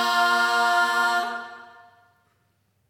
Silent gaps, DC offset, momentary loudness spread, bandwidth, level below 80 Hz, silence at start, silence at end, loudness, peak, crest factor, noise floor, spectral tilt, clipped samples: none; under 0.1%; 14 LU; 19.5 kHz; -82 dBFS; 0 s; 1.25 s; -21 LUFS; -8 dBFS; 16 dB; -68 dBFS; 0 dB/octave; under 0.1%